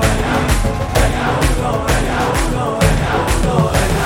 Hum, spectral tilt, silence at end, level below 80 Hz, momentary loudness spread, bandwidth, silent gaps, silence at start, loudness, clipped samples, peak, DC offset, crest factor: none; -5 dB/octave; 0 s; -20 dBFS; 2 LU; 17 kHz; none; 0 s; -16 LUFS; under 0.1%; 0 dBFS; under 0.1%; 14 dB